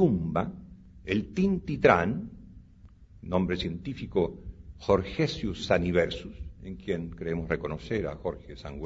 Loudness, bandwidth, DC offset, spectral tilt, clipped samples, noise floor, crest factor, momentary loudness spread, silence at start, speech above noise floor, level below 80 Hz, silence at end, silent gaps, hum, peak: -29 LUFS; 7.8 kHz; under 0.1%; -7 dB/octave; under 0.1%; -53 dBFS; 24 dB; 18 LU; 0 s; 25 dB; -46 dBFS; 0 s; none; none; -4 dBFS